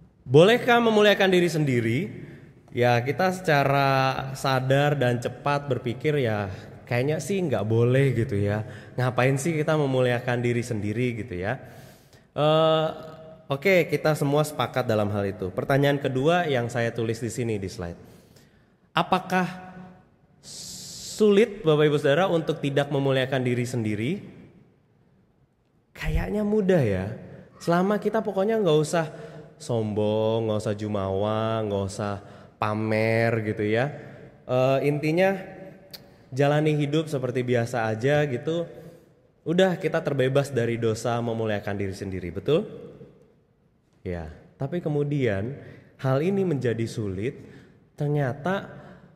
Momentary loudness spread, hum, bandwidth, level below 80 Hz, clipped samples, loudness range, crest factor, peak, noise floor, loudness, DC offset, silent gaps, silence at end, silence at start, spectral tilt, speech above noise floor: 15 LU; none; 15.5 kHz; -50 dBFS; under 0.1%; 6 LU; 20 dB; -6 dBFS; -65 dBFS; -24 LUFS; under 0.1%; none; 0.2 s; 0.25 s; -6.5 dB/octave; 41 dB